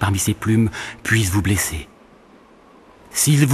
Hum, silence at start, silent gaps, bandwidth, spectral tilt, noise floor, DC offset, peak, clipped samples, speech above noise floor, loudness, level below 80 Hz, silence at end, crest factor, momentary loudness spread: none; 0 s; none; 13.5 kHz; -4.5 dB/octave; -48 dBFS; under 0.1%; -2 dBFS; under 0.1%; 30 dB; -19 LUFS; -40 dBFS; 0 s; 18 dB; 9 LU